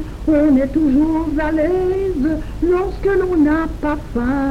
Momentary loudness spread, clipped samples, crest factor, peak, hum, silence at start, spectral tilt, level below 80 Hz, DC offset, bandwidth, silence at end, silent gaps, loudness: 6 LU; under 0.1%; 10 dB; -6 dBFS; none; 0 s; -8 dB/octave; -28 dBFS; under 0.1%; 9.4 kHz; 0 s; none; -17 LUFS